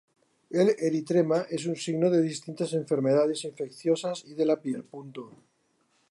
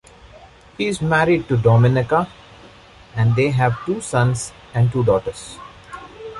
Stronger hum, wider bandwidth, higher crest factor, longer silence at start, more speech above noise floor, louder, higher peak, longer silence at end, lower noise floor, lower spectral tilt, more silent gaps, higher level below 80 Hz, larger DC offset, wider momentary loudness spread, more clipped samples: neither; about the same, 11.5 kHz vs 11.5 kHz; about the same, 16 dB vs 16 dB; first, 0.5 s vs 0.35 s; first, 43 dB vs 27 dB; second, -27 LUFS vs -18 LUFS; second, -12 dBFS vs -2 dBFS; first, 0.8 s vs 0 s; first, -71 dBFS vs -45 dBFS; about the same, -6 dB/octave vs -6.5 dB/octave; neither; second, -80 dBFS vs -44 dBFS; neither; second, 12 LU vs 20 LU; neither